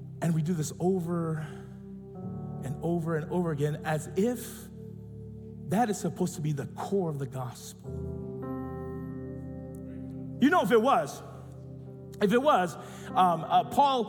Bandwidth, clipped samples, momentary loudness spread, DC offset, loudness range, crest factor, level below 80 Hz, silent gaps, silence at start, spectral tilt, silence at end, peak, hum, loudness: 18 kHz; under 0.1%; 20 LU; under 0.1%; 8 LU; 18 dB; -58 dBFS; none; 0 s; -6 dB/octave; 0 s; -12 dBFS; none; -29 LUFS